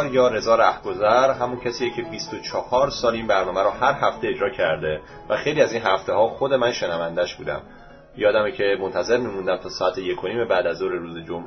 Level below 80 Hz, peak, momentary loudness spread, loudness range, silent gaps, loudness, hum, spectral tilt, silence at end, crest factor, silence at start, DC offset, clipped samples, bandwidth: -50 dBFS; -4 dBFS; 10 LU; 2 LU; none; -22 LUFS; none; -4.5 dB/octave; 0 s; 18 dB; 0 s; under 0.1%; under 0.1%; 6.4 kHz